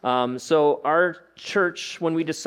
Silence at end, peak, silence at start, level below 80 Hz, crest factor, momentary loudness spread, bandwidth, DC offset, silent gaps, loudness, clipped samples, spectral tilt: 0 s; -8 dBFS; 0.05 s; -72 dBFS; 16 dB; 7 LU; 14 kHz; under 0.1%; none; -23 LUFS; under 0.1%; -4.5 dB/octave